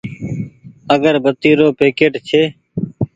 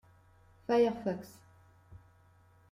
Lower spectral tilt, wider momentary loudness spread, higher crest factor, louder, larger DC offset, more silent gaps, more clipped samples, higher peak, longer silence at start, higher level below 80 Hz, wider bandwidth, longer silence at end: about the same, -7 dB/octave vs -6.5 dB/octave; second, 13 LU vs 20 LU; about the same, 16 dB vs 20 dB; first, -15 LUFS vs -32 LUFS; neither; neither; neither; first, 0 dBFS vs -16 dBFS; second, 0.05 s vs 0.7 s; first, -48 dBFS vs -68 dBFS; second, 7.8 kHz vs 15 kHz; second, 0.1 s vs 0.75 s